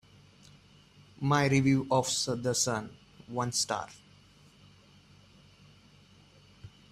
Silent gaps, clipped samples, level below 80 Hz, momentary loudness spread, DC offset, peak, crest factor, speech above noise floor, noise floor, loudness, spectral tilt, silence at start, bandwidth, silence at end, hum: none; under 0.1%; -64 dBFS; 12 LU; under 0.1%; -12 dBFS; 22 dB; 30 dB; -59 dBFS; -29 LUFS; -4 dB/octave; 1.2 s; 14.5 kHz; 0.25 s; none